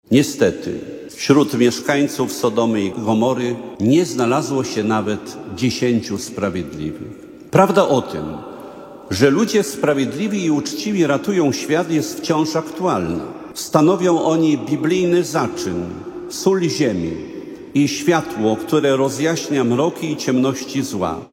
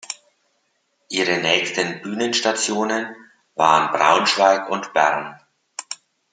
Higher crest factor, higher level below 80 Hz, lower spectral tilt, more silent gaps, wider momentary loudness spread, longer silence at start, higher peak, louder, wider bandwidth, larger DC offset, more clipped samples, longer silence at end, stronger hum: about the same, 18 dB vs 20 dB; first, -52 dBFS vs -72 dBFS; first, -5.5 dB/octave vs -2.5 dB/octave; neither; second, 13 LU vs 18 LU; about the same, 0.1 s vs 0.1 s; about the same, 0 dBFS vs 0 dBFS; about the same, -18 LUFS vs -19 LUFS; first, 16.5 kHz vs 9.6 kHz; neither; neither; second, 0.05 s vs 0.4 s; neither